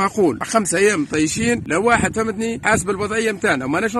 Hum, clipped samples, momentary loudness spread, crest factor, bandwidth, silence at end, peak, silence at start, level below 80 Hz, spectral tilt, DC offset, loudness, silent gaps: none; under 0.1%; 5 LU; 18 dB; 13.5 kHz; 0 s; 0 dBFS; 0 s; -46 dBFS; -4 dB/octave; under 0.1%; -18 LUFS; none